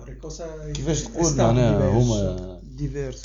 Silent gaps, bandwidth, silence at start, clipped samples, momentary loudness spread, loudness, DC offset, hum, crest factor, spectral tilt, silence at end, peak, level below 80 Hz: none; 7.6 kHz; 0 s; under 0.1%; 16 LU; -22 LUFS; under 0.1%; none; 18 dB; -6 dB/octave; 0 s; -4 dBFS; -34 dBFS